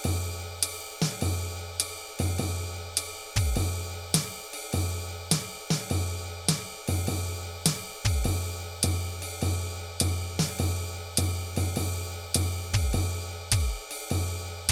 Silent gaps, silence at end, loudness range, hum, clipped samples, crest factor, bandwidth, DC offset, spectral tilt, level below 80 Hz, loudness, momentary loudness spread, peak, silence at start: none; 0 s; 1 LU; none; under 0.1%; 22 dB; 17.5 kHz; under 0.1%; -4 dB/octave; -40 dBFS; -30 LUFS; 6 LU; -8 dBFS; 0 s